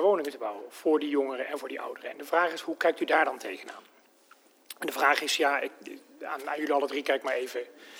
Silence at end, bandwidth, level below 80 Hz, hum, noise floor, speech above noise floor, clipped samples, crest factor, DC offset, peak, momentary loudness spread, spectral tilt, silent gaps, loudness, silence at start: 0 s; over 20 kHz; under -90 dBFS; none; -60 dBFS; 30 dB; under 0.1%; 22 dB; under 0.1%; -8 dBFS; 15 LU; -2 dB/octave; none; -29 LUFS; 0 s